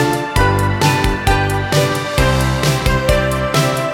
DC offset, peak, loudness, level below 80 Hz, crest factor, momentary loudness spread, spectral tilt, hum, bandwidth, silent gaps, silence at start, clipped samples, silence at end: under 0.1%; 0 dBFS; -15 LUFS; -24 dBFS; 14 dB; 2 LU; -5 dB/octave; none; 19 kHz; none; 0 s; under 0.1%; 0 s